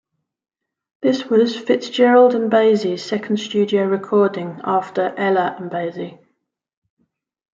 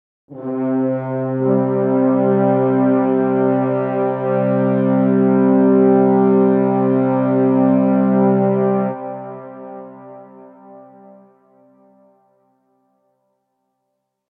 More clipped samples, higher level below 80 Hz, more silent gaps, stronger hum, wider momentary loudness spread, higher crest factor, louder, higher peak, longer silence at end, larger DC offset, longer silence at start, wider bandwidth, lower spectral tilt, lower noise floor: neither; first, -70 dBFS vs -82 dBFS; neither; neither; second, 12 LU vs 15 LU; about the same, 16 dB vs 14 dB; about the same, -18 LUFS vs -16 LUFS; about the same, -2 dBFS vs -4 dBFS; second, 1.4 s vs 3.5 s; neither; first, 1 s vs 0.3 s; first, 7.6 kHz vs 3.4 kHz; second, -6 dB/octave vs -13 dB/octave; about the same, -72 dBFS vs -74 dBFS